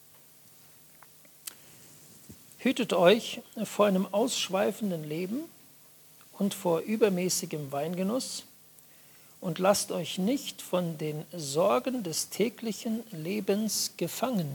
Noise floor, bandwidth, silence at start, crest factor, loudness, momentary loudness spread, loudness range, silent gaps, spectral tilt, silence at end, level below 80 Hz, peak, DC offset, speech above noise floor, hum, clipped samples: -56 dBFS; 19 kHz; 1.45 s; 22 dB; -29 LUFS; 18 LU; 4 LU; none; -4.5 dB/octave; 0 s; -76 dBFS; -8 dBFS; under 0.1%; 27 dB; none; under 0.1%